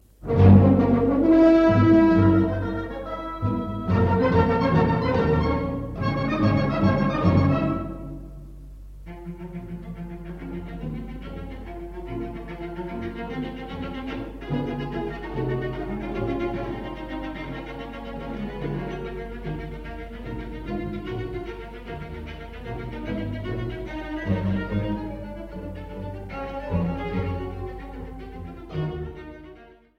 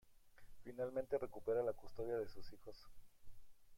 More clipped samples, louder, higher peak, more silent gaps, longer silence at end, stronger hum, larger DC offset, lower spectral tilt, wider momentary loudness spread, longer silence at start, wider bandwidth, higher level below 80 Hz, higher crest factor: neither; first, -24 LUFS vs -44 LUFS; first, -2 dBFS vs -28 dBFS; neither; first, 0.3 s vs 0 s; neither; neither; first, -9.5 dB/octave vs -7 dB/octave; about the same, 19 LU vs 19 LU; first, 0.2 s vs 0.05 s; second, 6.4 kHz vs 16.5 kHz; first, -38 dBFS vs -64 dBFS; about the same, 22 dB vs 18 dB